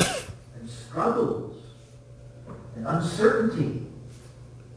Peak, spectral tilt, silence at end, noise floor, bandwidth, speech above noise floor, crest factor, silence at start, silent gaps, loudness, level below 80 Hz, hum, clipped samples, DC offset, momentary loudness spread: -6 dBFS; -5.5 dB/octave; 0 s; -48 dBFS; 11 kHz; 23 dB; 22 dB; 0 s; none; -26 LUFS; -54 dBFS; none; under 0.1%; under 0.1%; 25 LU